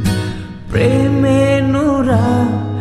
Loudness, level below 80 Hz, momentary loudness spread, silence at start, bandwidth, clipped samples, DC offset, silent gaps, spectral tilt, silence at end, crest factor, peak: -14 LUFS; -34 dBFS; 8 LU; 0 s; 13.5 kHz; under 0.1%; under 0.1%; none; -7.5 dB/octave; 0 s; 12 dB; -2 dBFS